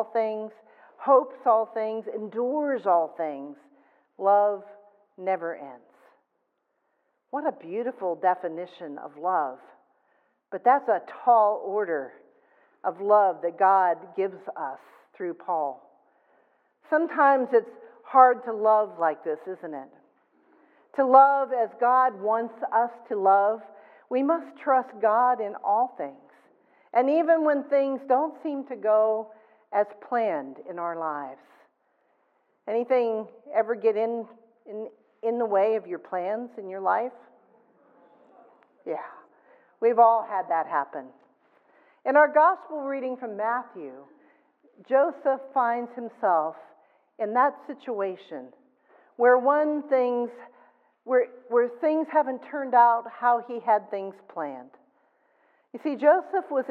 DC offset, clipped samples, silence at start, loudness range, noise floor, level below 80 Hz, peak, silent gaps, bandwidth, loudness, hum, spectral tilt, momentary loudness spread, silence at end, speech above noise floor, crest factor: under 0.1%; under 0.1%; 0 s; 7 LU; -76 dBFS; under -90 dBFS; -4 dBFS; none; 4.9 kHz; -25 LUFS; none; -8 dB/octave; 16 LU; 0 s; 51 dB; 22 dB